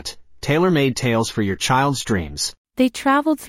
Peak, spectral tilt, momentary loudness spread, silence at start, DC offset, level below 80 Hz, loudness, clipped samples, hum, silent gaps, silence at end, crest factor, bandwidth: -4 dBFS; -5 dB/octave; 8 LU; 0.05 s; under 0.1%; -46 dBFS; -19 LUFS; under 0.1%; none; 2.58-2.65 s; 0 s; 14 dB; 16.5 kHz